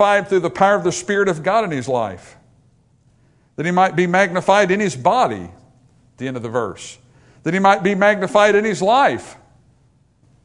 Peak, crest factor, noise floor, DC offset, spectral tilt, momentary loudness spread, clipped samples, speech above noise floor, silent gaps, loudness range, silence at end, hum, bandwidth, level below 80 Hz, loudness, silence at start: 0 dBFS; 18 dB; -57 dBFS; under 0.1%; -5 dB/octave; 14 LU; under 0.1%; 40 dB; none; 4 LU; 1.1 s; none; 11 kHz; -58 dBFS; -17 LUFS; 0 s